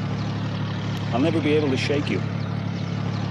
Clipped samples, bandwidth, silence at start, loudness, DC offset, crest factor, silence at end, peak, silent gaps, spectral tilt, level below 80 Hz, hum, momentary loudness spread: under 0.1%; 10 kHz; 0 s; -24 LUFS; under 0.1%; 14 dB; 0 s; -10 dBFS; none; -7 dB/octave; -50 dBFS; none; 6 LU